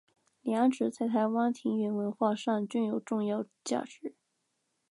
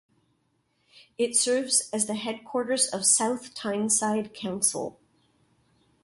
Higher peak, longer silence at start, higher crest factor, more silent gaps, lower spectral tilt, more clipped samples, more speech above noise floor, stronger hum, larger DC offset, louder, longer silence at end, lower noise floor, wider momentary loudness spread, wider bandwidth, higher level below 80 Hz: second, -14 dBFS vs -8 dBFS; second, 0.45 s vs 1.2 s; about the same, 18 dB vs 20 dB; neither; first, -6 dB/octave vs -2 dB/octave; neither; first, 49 dB vs 45 dB; neither; neither; second, -31 LUFS vs -25 LUFS; second, 0.8 s vs 1.15 s; first, -80 dBFS vs -72 dBFS; second, 8 LU vs 11 LU; about the same, 11.5 kHz vs 12 kHz; second, -86 dBFS vs -72 dBFS